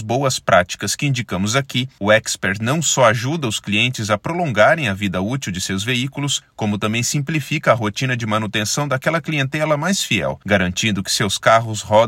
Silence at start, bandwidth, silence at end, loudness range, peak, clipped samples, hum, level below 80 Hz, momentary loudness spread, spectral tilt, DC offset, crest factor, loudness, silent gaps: 0 s; 16.5 kHz; 0 s; 2 LU; 0 dBFS; under 0.1%; none; -54 dBFS; 7 LU; -4 dB/octave; under 0.1%; 18 dB; -18 LUFS; none